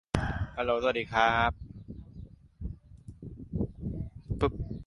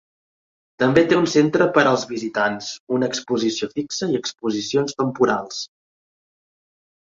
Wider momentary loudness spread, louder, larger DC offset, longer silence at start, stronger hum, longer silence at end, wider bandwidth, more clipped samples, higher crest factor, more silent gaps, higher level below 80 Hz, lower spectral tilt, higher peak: first, 22 LU vs 9 LU; second, -30 LUFS vs -20 LUFS; neither; second, 0.15 s vs 0.8 s; neither; second, 0.05 s vs 1.4 s; first, 11.5 kHz vs 7.8 kHz; neither; about the same, 24 dB vs 20 dB; second, none vs 2.80-2.87 s; first, -44 dBFS vs -58 dBFS; first, -6.5 dB/octave vs -4.5 dB/octave; second, -8 dBFS vs -2 dBFS